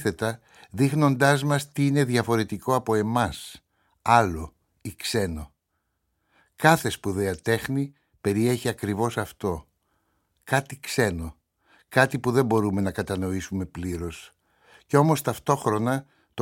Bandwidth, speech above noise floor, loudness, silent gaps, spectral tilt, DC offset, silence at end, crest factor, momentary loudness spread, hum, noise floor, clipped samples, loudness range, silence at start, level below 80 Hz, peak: 17 kHz; 52 dB; -25 LUFS; none; -5.5 dB/octave; under 0.1%; 0 s; 24 dB; 15 LU; none; -77 dBFS; under 0.1%; 5 LU; 0 s; -50 dBFS; -2 dBFS